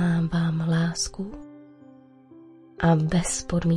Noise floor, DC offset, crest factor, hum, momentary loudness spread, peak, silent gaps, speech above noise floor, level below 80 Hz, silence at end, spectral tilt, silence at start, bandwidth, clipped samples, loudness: -50 dBFS; under 0.1%; 18 dB; none; 15 LU; -8 dBFS; none; 27 dB; -44 dBFS; 0 s; -5.5 dB/octave; 0 s; 11.5 kHz; under 0.1%; -24 LUFS